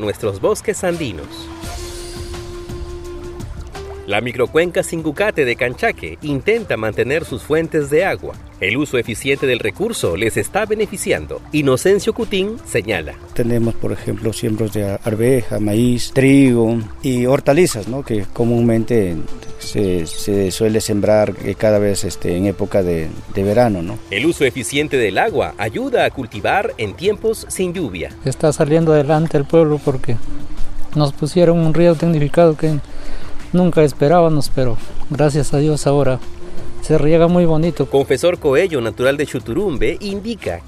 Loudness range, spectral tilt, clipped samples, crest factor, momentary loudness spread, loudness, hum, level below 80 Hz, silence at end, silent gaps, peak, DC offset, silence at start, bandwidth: 4 LU; -6 dB/octave; under 0.1%; 16 dB; 15 LU; -17 LUFS; none; -32 dBFS; 0 s; none; 0 dBFS; under 0.1%; 0 s; 15 kHz